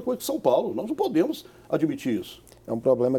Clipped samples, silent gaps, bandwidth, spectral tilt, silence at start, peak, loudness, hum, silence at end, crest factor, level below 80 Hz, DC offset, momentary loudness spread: under 0.1%; none; 18.5 kHz; -6 dB/octave; 0 s; -8 dBFS; -26 LUFS; none; 0 s; 18 dB; -62 dBFS; under 0.1%; 11 LU